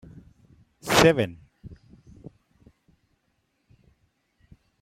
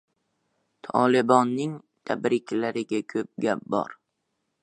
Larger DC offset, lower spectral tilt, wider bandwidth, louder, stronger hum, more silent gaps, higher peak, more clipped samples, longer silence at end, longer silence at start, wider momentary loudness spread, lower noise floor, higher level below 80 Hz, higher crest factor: neither; second, -4 dB/octave vs -6 dB/octave; first, 16 kHz vs 10 kHz; first, -21 LUFS vs -25 LUFS; neither; neither; about the same, -2 dBFS vs -4 dBFS; neither; first, 3.05 s vs 0.7 s; about the same, 0.85 s vs 0.85 s; first, 29 LU vs 12 LU; second, -73 dBFS vs -78 dBFS; first, -52 dBFS vs -74 dBFS; first, 28 dB vs 22 dB